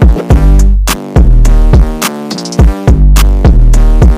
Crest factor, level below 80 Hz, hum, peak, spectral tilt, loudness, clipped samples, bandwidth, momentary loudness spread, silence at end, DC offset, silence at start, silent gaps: 4 dB; -6 dBFS; none; 0 dBFS; -6 dB/octave; -9 LUFS; 0.9%; 16 kHz; 6 LU; 0 s; under 0.1%; 0 s; none